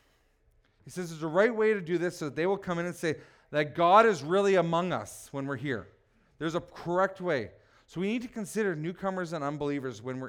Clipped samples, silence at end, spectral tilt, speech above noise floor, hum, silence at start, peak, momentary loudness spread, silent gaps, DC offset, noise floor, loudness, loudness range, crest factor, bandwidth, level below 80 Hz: under 0.1%; 0 s; -6 dB/octave; 38 dB; none; 0.85 s; -8 dBFS; 13 LU; none; under 0.1%; -67 dBFS; -29 LUFS; 7 LU; 22 dB; 16.5 kHz; -66 dBFS